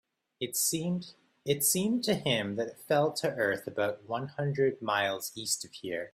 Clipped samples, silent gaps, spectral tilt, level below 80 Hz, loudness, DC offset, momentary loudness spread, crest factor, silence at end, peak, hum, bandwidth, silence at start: under 0.1%; none; -3.5 dB/octave; -70 dBFS; -31 LUFS; under 0.1%; 9 LU; 18 dB; 0.05 s; -14 dBFS; none; 16 kHz; 0.4 s